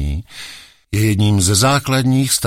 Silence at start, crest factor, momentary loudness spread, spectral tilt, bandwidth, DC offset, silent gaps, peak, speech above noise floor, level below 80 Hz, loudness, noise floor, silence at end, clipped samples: 0 s; 16 dB; 19 LU; -4.5 dB/octave; 16.5 kHz; under 0.1%; none; 0 dBFS; 23 dB; -32 dBFS; -15 LUFS; -37 dBFS; 0 s; under 0.1%